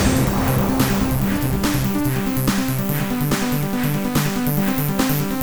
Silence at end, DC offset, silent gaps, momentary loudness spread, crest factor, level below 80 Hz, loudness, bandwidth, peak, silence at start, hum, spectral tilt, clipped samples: 0 s; under 0.1%; none; 3 LU; 14 dB; -32 dBFS; -20 LUFS; over 20 kHz; -4 dBFS; 0 s; none; -5.5 dB/octave; under 0.1%